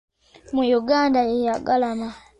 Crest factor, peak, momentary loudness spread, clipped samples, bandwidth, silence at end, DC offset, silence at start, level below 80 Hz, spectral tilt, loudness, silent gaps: 14 dB; -8 dBFS; 8 LU; under 0.1%; 9.8 kHz; 0.2 s; under 0.1%; 0.5 s; -54 dBFS; -5 dB/octave; -21 LUFS; none